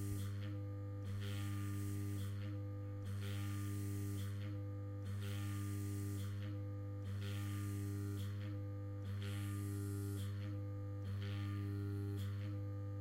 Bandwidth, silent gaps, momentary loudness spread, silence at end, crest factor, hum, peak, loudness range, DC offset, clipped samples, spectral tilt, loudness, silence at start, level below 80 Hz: 16 kHz; none; 3 LU; 0 s; 12 dB; none; -32 dBFS; 1 LU; under 0.1%; under 0.1%; -6.5 dB/octave; -45 LUFS; 0 s; -68 dBFS